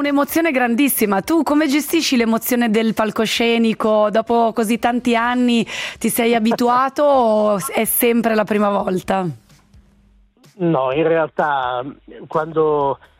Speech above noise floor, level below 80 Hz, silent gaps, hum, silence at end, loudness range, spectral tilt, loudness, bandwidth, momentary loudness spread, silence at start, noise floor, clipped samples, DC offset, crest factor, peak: 36 dB; -54 dBFS; none; none; 0.25 s; 4 LU; -4.5 dB/octave; -17 LUFS; 16 kHz; 5 LU; 0 s; -53 dBFS; under 0.1%; under 0.1%; 12 dB; -4 dBFS